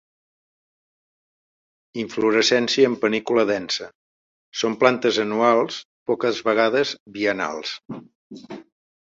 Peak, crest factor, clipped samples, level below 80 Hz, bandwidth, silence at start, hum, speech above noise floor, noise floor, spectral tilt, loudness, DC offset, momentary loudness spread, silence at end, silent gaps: -2 dBFS; 20 dB; under 0.1%; -68 dBFS; 7.8 kHz; 1.95 s; none; over 69 dB; under -90 dBFS; -3.5 dB/octave; -21 LUFS; under 0.1%; 19 LU; 0.55 s; 3.95-4.52 s, 5.85-6.06 s, 7.00-7.06 s, 8.15-8.30 s